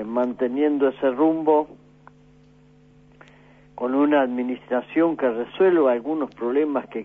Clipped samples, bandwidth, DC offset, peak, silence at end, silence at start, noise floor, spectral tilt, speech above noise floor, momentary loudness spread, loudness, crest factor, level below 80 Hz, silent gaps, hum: under 0.1%; 4 kHz; under 0.1%; -8 dBFS; 0 s; 0 s; -53 dBFS; -8.5 dB/octave; 32 dB; 8 LU; -22 LUFS; 14 dB; -64 dBFS; none; 50 Hz at -55 dBFS